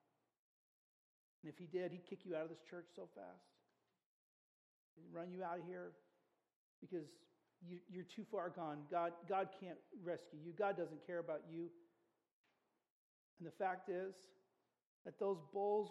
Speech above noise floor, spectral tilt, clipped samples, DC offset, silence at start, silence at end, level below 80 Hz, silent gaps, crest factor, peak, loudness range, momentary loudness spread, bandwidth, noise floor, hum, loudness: 38 dB; -7 dB/octave; under 0.1%; under 0.1%; 1.45 s; 0 s; under -90 dBFS; 4.06-4.97 s, 6.56-6.82 s, 12.32-12.44 s, 12.90-13.37 s, 14.86-15.05 s; 20 dB; -28 dBFS; 9 LU; 16 LU; 11.5 kHz; -85 dBFS; none; -47 LUFS